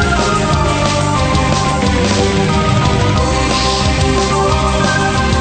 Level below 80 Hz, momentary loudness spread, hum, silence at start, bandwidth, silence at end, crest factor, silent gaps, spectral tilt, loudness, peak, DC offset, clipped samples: -22 dBFS; 1 LU; none; 0 s; 9.2 kHz; 0 s; 12 dB; none; -5 dB/octave; -13 LUFS; 0 dBFS; under 0.1%; under 0.1%